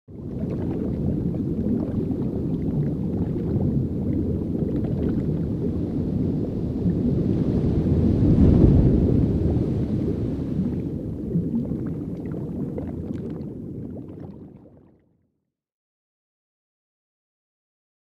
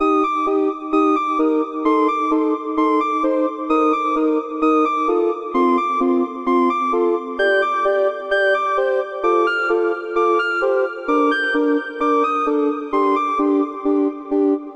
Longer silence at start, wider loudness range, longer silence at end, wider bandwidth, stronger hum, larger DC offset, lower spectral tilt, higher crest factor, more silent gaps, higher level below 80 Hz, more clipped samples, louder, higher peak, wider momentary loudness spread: about the same, 0.1 s vs 0 s; first, 14 LU vs 1 LU; first, 3.45 s vs 0 s; second, 6 kHz vs 8.4 kHz; neither; neither; first, -11.5 dB/octave vs -4 dB/octave; first, 20 dB vs 12 dB; neither; first, -34 dBFS vs -56 dBFS; neither; second, -24 LUFS vs -18 LUFS; about the same, -4 dBFS vs -6 dBFS; first, 12 LU vs 3 LU